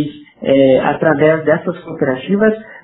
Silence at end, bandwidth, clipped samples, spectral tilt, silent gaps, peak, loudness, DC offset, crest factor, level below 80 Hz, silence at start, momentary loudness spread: 0.05 s; 4 kHz; under 0.1%; -5.5 dB/octave; none; 0 dBFS; -14 LUFS; under 0.1%; 14 dB; -50 dBFS; 0 s; 11 LU